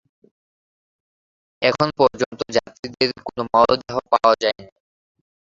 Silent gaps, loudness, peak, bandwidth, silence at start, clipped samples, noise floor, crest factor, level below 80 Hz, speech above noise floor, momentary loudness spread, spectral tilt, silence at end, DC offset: 2.26-2.31 s, 2.79-2.83 s; -20 LUFS; 0 dBFS; 7.8 kHz; 1.6 s; under 0.1%; under -90 dBFS; 22 dB; -54 dBFS; over 71 dB; 9 LU; -4.5 dB/octave; 0.75 s; under 0.1%